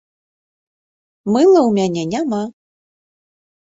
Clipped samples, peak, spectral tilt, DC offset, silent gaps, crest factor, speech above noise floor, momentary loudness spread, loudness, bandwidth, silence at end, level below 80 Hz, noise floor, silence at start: under 0.1%; -2 dBFS; -6.5 dB/octave; under 0.1%; none; 16 dB; over 76 dB; 15 LU; -15 LUFS; 7.8 kHz; 1.15 s; -60 dBFS; under -90 dBFS; 1.25 s